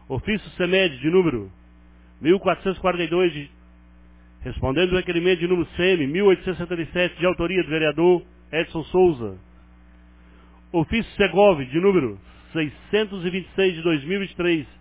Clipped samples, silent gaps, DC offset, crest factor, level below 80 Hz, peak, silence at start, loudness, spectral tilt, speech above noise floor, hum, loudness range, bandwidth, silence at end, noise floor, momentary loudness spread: under 0.1%; none; under 0.1%; 18 dB; -44 dBFS; -4 dBFS; 0.1 s; -22 LUFS; -10.5 dB/octave; 28 dB; 60 Hz at -50 dBFS; 3 LU; 4 kHz; 0.15 s; -49 dBFS; 9 LU